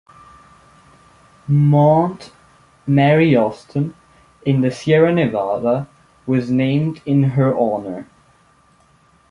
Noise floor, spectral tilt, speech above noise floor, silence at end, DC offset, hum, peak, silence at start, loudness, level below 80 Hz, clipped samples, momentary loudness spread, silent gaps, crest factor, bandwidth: -54 dBFS; -8.5 dB/octave; 38 dB; 1.25 s; under 0.1%; none; -2 dBFS; 1.5 s; -17 LUFS; -54 dBFS; under 0.1%; 16 LU; none; 16 dB; 10 kHz